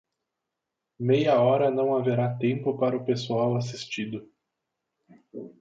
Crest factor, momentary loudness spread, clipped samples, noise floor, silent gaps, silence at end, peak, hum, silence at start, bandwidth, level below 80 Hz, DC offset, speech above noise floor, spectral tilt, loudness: 16 dB; 16 LU; under 0.1%; -85 dBFS; none; 0.1 s; -10 dBFS; none; 1 s; 7.8 kHz; -70 dBFS; under 0.1%; 60 dB; -7 dB/octave; -25 LUFS